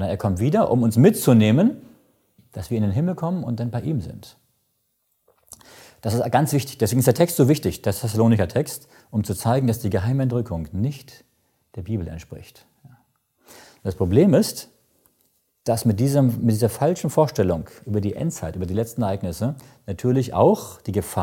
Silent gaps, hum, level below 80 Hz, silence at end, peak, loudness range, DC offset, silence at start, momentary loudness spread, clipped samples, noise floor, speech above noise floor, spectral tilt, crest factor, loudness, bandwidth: none; none; -50 dBFS; 0 s; -2 dBFS; 7 LU; under 0.1%; 0 s; 15 LU; under 0.1%; -71 dBFS; 50 dB; -7 dB/octave; 20 dB; -21 LUFS; 17 kHz